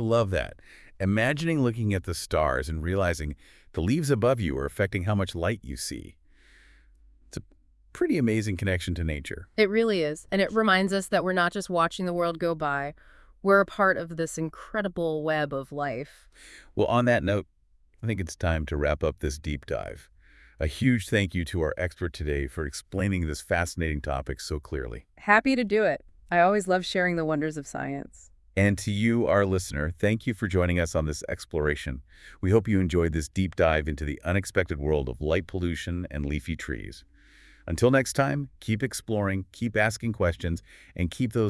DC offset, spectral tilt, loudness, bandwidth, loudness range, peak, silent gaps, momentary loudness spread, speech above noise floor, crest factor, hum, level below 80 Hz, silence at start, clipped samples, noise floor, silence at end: under 0.1%; -6 dB/octave; -27 LUFS; 12 kHz; 5 LU; -4 dBFS; none; 11 LU; 32 dB; 22 dB; none; -44 dBFS; 0 s; under 0.1%; -58 dBFS; 0 s